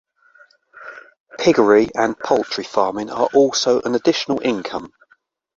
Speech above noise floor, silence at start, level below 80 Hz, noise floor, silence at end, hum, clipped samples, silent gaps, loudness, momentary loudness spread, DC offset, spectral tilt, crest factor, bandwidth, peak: 42 dB; 0.75 s; -58 dBFS; -59 dBFS; 0.7 s; none; under 0.1%; 1.20-1.26 s; -18 LUFS; 22 LU; under 0.1%; -4 dB/octave; 18 dB; 7.8 kHz; -2 dBFS